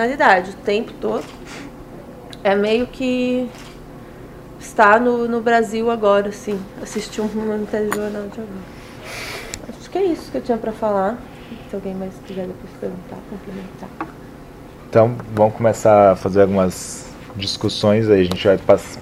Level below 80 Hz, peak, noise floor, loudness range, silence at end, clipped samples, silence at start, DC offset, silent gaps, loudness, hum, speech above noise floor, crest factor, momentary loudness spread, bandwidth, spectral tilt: -46 dBFS; 0 dBFS; -38 dBFS; 9 LU; 0 s; under 0.1%; 0 s; under 0.1%; none; -18 LUFS; none; 20 dB; 20 dB; 22 LU; 16 kHz; -5.5 dB/octave